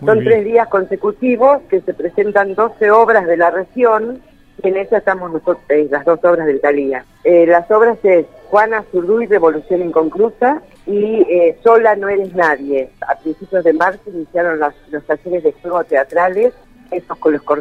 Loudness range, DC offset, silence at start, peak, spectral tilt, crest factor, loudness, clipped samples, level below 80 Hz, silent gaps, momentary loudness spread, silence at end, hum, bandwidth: 4 LU; under 0.1%; 0 s; 0 dBFS; -8 dB/octave; 14 dB; -14 LUFS; under 0.1%; -50 dBFS; none; 10 LU; 0 s; none; 6.2 kHz